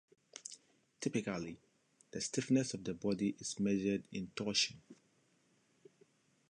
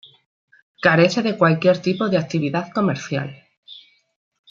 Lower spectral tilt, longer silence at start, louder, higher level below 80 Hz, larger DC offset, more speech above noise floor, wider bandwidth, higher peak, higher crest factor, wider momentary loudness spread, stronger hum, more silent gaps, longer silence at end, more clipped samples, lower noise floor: second, -4 dB/octave vs -6.5 dB/octave; second, 0.35 s vs 0.8 s; second, -37 LUFS vs -19 LUFS; second, -72 dBFS vs -64 dBFS; neither; first, 37 dB vs 27 dB; first, 11 kHz vs 7.6 kHz; second, -20 dBFS vs -2 dBFS; about the same, 22 dB vs 20 dB; first, 17 LU vs 10 LU; neither; second, none vs 3.57-3.63 s; first, 1.55 s vs 0.7 s; neither; first, -74 dBFS vs -46 dBFS